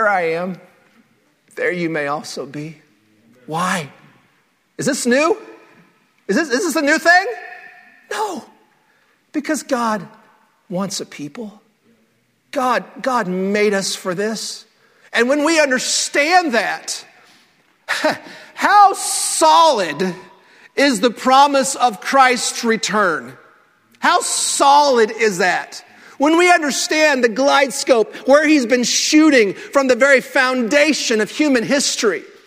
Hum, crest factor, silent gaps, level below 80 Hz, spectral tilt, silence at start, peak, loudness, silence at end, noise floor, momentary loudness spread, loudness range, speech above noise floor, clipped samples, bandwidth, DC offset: none; 18 dB; none; -68 dBFS; -2.5 dB/octave; 0 s; 0 dBFS; -16 LUFS; 0.2 s; -61 dBFS; 16 LU; 11 LU; 45 dB; under 0.1%; 16 kHz; under 0.1%